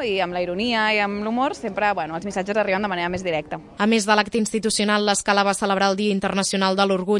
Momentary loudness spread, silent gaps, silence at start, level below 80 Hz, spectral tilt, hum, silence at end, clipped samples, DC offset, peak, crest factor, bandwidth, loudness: 6 LU; none; 0 s; -54 dBFS; -3.5 dB/octave; none; 0 s; under 0.1%; under 0.1%; -4 dBFS; 18 dB; 11.5 kHz; -21 LUFS